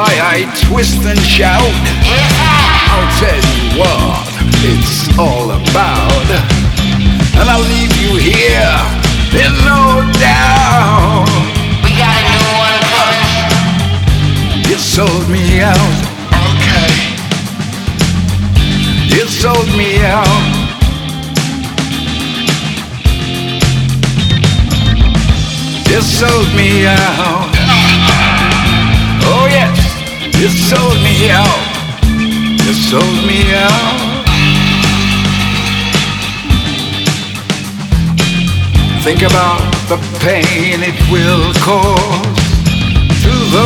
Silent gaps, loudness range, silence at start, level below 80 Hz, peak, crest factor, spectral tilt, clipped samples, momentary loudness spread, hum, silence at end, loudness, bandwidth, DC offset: none; 4 LU; 0 s; -18 dBFS; 0 dBFS; 10 dB; -4.5 dB/octave; 0.9%; 7 LU; none; 0 s; -10 LUFS; 19 kHz; under 0.1%